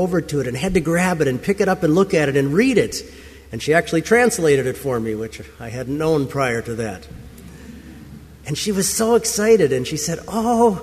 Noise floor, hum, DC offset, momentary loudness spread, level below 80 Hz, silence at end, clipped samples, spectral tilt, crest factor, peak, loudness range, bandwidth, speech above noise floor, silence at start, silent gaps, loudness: -39 dBFS; none; under 0.1%; 20 LU; -44 dBFS; 0 s; under 0.1%; -5 dB/octave; 16 dB; -2 dBFS; 7 LU; 15.5 kHz; 21 dB; 0 s; none; -19 LUFS